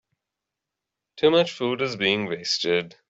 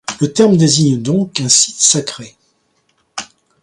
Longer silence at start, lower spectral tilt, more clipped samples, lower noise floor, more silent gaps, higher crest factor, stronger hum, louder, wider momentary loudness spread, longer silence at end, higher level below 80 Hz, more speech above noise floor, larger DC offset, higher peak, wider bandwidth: first, 1.15 s vs 0.1 s; about the same, -4 dB/octave vs -4 dB/octave; neither; first, -85 dBFS vs -61 dBFS; neither; about the same, 20 dB vs 16 dB; neither; second, -23 LUFS vs -12 LUFS; second, 6 LU vs 18 LU; second, 0.2 s vs 0.4 s; second, -68 dBFS vs -56 dBFS; first, 62 dB vs 48 dB; neither; second, -6 dBFS vs 0 dBFS; second, 8 kHz vs 13 kHz